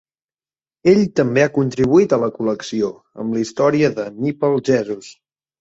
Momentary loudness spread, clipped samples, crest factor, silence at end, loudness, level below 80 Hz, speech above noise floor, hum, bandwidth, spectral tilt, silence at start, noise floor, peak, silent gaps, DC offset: 9 LU; under 0.1%; 16 dB; 0.5 s; -18 LUFS; -54 dBFS; over 73 dB; none; 8 kHz; -6.5 dB/octave; 0.85 s; under -90 dBFS; -2 dBFS; none; under 0.1%